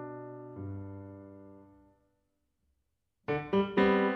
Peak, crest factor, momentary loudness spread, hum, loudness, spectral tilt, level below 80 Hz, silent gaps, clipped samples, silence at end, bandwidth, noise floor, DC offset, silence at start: -14 dBFS; 20 dB; 23 LU; none; -32 LUFS; -8.5 dB/octave; -64 dBFS; none; under 0.1%; 0 s; 6 kHz; -81 dBFS; under 0.1%; 0 s